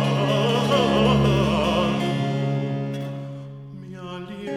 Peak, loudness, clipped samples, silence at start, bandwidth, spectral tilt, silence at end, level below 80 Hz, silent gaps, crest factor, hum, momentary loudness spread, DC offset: -6 dBFS; -21 LUFS; under 0.1%; 0 s; 13 kHz; -6.5 dB/octave; 0 s; -40 dBFS; none; 16 dB; none; 18 LU; under 0.1%